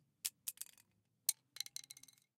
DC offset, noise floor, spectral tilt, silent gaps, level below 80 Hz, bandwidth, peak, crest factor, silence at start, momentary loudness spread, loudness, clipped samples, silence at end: under 0.1%; -76 dBFS; 3 dB/octave; none; under -90 dBFS; 17 kHz; -10 dBFS; 38 dB; 0.25 s; 14 LU; -44 LUFS; under 0.1%; 0.75 s